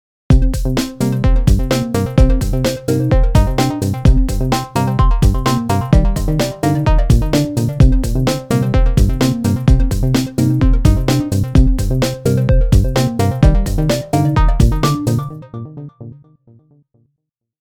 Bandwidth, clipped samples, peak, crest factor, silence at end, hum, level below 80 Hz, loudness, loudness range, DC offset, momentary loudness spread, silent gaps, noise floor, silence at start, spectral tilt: 16.5 kHz; under 0.1%; 0 dBFS; 14 dB; 1.45 s; none; -16 dBFS; -15 LUFS; 2 LU; under 0.1%; 4 LU; none; -74 dBFS; 0.3 s; -6.5 dB/octave